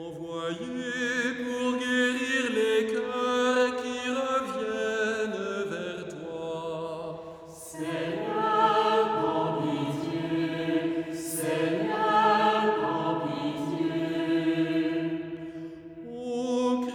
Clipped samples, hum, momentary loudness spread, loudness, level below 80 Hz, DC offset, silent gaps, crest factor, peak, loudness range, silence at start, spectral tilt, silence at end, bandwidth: under 0.1%; none; 13 LU; -28 LUFS; -66 dBFS; under 0.1%; none; 18 dB; -10 dBFS; 5 LU; 0 s; -4.5 dB/octave; 0 s; 19 kHz